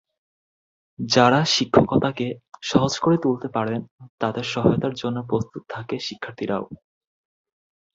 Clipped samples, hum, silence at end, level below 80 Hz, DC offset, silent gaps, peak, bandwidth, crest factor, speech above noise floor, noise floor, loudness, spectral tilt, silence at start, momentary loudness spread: under 0.1%; none; 1.2 s; -52 dBFS; under 0.1%; 3.91-3.98 s, 4.09-4.18 s; -2 dBFS; 7.8 kHz; 22 dB; over 68 dB; under -90 dBFS; -22 LUFS; -5 dB/octave; 1 s; 13 LU